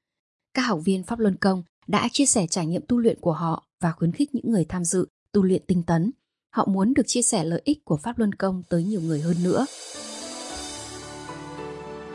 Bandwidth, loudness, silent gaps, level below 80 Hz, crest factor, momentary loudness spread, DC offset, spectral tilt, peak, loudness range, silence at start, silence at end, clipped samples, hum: 11.5 kHz; -24 LUFS; 1.69-1.82 s, 3.73-3.78 s, 5.10-5.26 s; -56 dBFS; 16 dB; 14 LU; under 0.1%; -5 dB/octave; -8 dBFS; 4 LU; 0.55 s; 0 s; under 0.1%; none